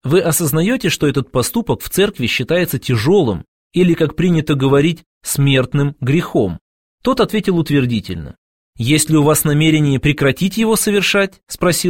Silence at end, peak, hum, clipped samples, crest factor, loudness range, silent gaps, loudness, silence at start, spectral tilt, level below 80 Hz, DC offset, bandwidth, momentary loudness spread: 0 s; 0 dBFS; none; under 0.1%; 14 dB; 3 LU; 3.48-3.70 s, 5.06-5.21 s, 6.61-6.98 s, 8.38-8.73 s; -15 LUFS; 0.05 s; -5 dB/octave; -40 dBFS; 0.6%; 16.5 kHz; 8 LU